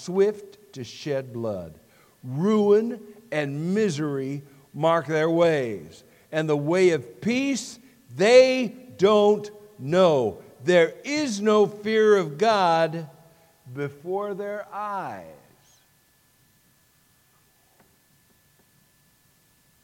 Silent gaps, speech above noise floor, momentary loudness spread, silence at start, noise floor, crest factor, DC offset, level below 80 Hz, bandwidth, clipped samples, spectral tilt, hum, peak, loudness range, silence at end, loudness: none; 40 dB; 19 LU; 0 s; -62 dBFS; 20 dB; under 0.1%; -70 dBFS; 16 kHz; under 0.1%; -5.5 dB/octave; none; -4 dBFS; 13 LU; 4.5 s; -23 LUFS